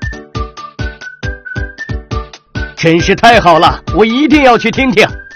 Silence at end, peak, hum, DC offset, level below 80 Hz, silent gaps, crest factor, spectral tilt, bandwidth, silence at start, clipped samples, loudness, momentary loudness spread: 0 s; 0 dBFS; none; under 0.1%; -26 dBFS; none; 12 dB; -5.5 dB/octave; 15 kHz; 0 s; 1%; -9 LUFS; 17 LU